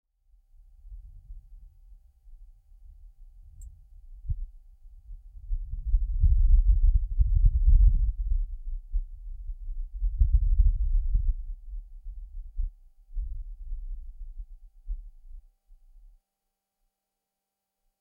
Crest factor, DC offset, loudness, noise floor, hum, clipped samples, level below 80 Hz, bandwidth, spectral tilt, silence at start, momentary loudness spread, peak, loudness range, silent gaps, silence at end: 20 dB; under 0.1%; -29 LUFS; -86 dBFS; none; under 0.1%; -28 dBFS; 0.3 kHz; -10.5 dB/octave; 0.85 s; 26 LU; -8 dBFS; 21 LU; none; 2.6 s